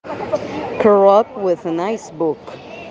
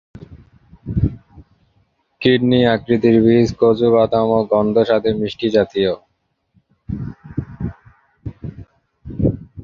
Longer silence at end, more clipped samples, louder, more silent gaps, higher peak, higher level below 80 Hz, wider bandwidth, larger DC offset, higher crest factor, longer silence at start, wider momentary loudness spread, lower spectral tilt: about the same, 0 s vs 0 s; neither; about the same, -17 LUFS vs -16 LUFS; neither; about the same, 0 dBFS vs 0 dBFS; second, -58 dBFS vs -38 dBFS; about the same, 7.6 kHz vs 7.2 kHz; neither; about the same, 16 dB vs 18 dB; second, 0.05 s vs 0.2 s; about the same, 16 LU vs 18 LU; second, -6.5 dB/octave vs -8 dB/octave